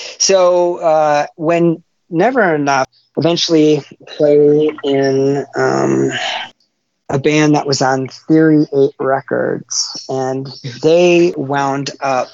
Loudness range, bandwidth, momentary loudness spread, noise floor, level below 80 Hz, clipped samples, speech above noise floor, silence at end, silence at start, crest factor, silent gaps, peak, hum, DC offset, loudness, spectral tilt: 2 LU; 7.8 kHz; 9 LU; -64 dBFS; -60 dBFS; under 0.1%; 51 dB; 0.05 s; 0 s; 14 dB; none; 0 dBFS; none; under 0.1%; -14 LUFS; -4.5 dB/octave